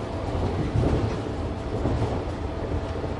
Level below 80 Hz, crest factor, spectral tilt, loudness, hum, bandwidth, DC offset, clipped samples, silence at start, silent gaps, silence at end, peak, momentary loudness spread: -32 dBFS; 18 dB; -8 dB/octave; -28 LUFS; none; 11 kHz; under 0.1%; under 0.1%; 0 s; none; 0 s; -10 dBFS; 6 LU